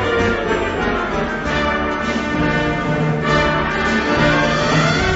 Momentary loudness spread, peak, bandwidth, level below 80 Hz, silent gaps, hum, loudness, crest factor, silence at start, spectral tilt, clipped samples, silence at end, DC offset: 5 LU; -4 dBFS; 8 kHz; -32 dBFS; none; none; -17 LUFS; 14 dB; 0 s; -5.5 dB/octave; under 0.1%; 0 s; under 0.1%